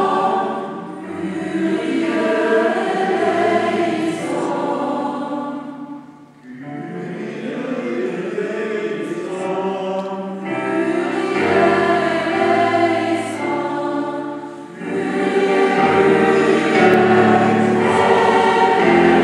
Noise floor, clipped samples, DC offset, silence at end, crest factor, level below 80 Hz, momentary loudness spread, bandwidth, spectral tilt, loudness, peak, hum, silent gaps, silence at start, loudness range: -41 dBFS; under 0.1%; under 0.1%; 0 s; 18 dB; -64 dBFS; 14 LU; 11.5 kHz; -6 dB/octave; -17 LUFS; 0 dBFS; none; none; 0 s; 11 LU